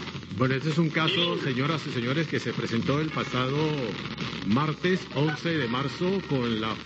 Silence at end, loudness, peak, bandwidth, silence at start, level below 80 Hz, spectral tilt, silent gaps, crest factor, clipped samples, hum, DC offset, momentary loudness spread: 0 s; -27 LUFS; -12 dBFS; 8.2 kHz; 0 s; -56 dBFS; -6 dB/octave; none; 16 dB; under 0.1%; none; under 0.1%; 5 LU